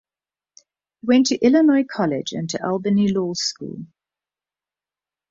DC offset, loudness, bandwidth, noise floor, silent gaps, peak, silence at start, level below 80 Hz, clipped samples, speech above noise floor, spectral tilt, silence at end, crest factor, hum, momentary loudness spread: under 0.1%; -19 LUFS; 7.6 kHz; under -90 dBFS; none; -4 dBFS; 1.05 s; -62 dBFS; under 0.1%; over 71 dB; -5 dB/octave; 1.45 s; 16 dB; none; 15 LU